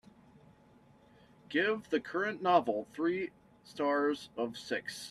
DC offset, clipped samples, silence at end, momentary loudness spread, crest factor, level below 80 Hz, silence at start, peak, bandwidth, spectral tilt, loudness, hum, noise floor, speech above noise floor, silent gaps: under 0.1%; under 0.1%; 0 s; 10 LU; 22 dB; -74 dBFS; 1.5 s; -14 dBFS; 13.5 kHz; -4.5 dB/octave; -33 LUFS; none; -62 dBFS; 29 dB; none